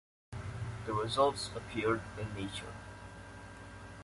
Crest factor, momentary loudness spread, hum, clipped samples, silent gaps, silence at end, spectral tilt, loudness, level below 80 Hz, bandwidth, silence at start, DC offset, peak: 22 dB; 19 LU; none; under 0.1%; none; 0 s; -5 dB/octave; -36 LUFS; -56 dBFS; 11.5 kHz; 0.3 s; under 0.1%; -16 dBFS